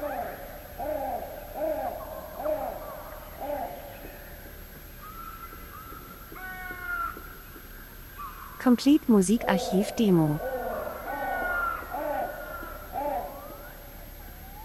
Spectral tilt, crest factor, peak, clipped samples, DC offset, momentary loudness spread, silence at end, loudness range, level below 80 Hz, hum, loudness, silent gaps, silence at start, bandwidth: -6 dB/octave; 22 dB; -8 dBFS; under 0.1%; under 0.1%; 21 LU; 0 s; 15 LU; -48 dBFS; none; -29 LUFS; none; 0 s; 16 kHz